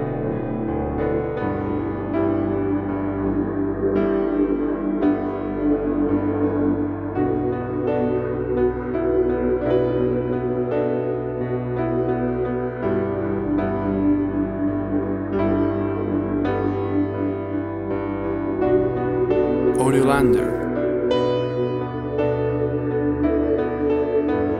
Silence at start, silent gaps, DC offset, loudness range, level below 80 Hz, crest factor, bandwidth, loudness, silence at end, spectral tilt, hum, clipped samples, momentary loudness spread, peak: 0 s; none; under 0.1%; 3 LU; -40 dBFS; 16 dB; 10 kHz; -22 LUFS; 0 s; -8 dB/octave; none; under 0.1%; 5 LU; -4 dBFS